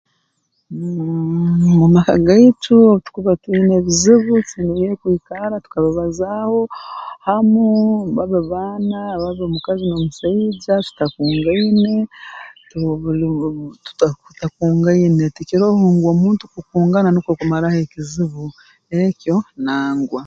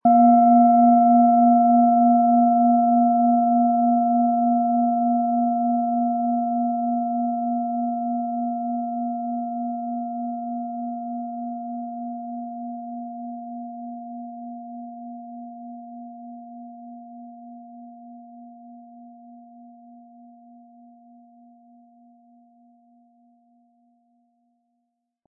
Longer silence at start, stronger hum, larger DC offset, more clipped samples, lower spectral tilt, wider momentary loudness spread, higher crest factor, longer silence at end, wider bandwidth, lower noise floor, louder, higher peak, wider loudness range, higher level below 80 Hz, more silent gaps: first, 0.7 s vs 0.05 s; neither; neither; neither; second, -6.5 dB/octave vs -14.5 dB/octave; second, 13 LU vs 24 LU; about the same, 16 dB vs 16 dB; second, 0 s vs 5.9 s; first, 7.8 kHz vs 2.2 kHz; second, -67 dBFS vs -77 dBFS; first, -16 LUFS vs -20 LUFS; first, 0 dBFS vs -6 dBFS; second, 7 LU vs 24 LU; first, -44 dBFS vs -86 dBFS; neither